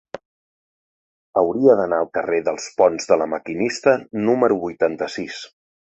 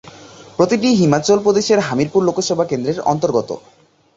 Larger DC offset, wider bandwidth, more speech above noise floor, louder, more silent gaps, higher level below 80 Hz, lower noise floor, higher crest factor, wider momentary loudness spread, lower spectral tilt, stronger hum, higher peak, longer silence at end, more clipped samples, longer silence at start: neither; about the same, 8.2 kHz vs 8 kHz; first, over 71 dB vs 24 dB; second, -20 LUFS vs -16 LUFS; first, 0.25-1.33 s vs none; second, -60 dBFS vs -54 dBFS; first, under -90 dBFS vs -40 dBFS; about the same, 18 dB vs 16 dB; first, 14 LU vs 7 LU; about the same, -5 dB/octave vs -5.5 dB/octave; neither; about the same, -2 dBFS vs 0 dBFS; second, 0.4 s vs 0.55 s; neither; about the same, 0.15 s vs 0.05 s